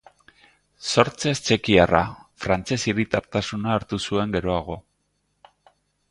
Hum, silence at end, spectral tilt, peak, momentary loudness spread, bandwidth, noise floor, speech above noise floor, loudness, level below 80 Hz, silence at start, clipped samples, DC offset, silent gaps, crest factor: 50 Hz at -50 dBFS; 1.3 s; -5 dB/octave; 0 dBFS; 13 LU; 11.5 kHz; -71 dBFS; 49 dB; -23 LUFS; -46 dBFS; 0.8 s; under 0.1%; under 0.1%; none; 24 dB